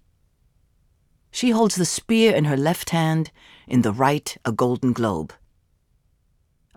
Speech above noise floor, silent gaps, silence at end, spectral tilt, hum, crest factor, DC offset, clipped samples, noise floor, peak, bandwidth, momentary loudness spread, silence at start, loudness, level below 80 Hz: 44 dB; none; 1.5 s; -5 dB/octave; none; 18 dB; under 0.1%; under 0.1%; -65 dBFS; -4 dBFS; 17 kHz; 9 LU; 1.35 s; -21 LUFS; -58 dBFS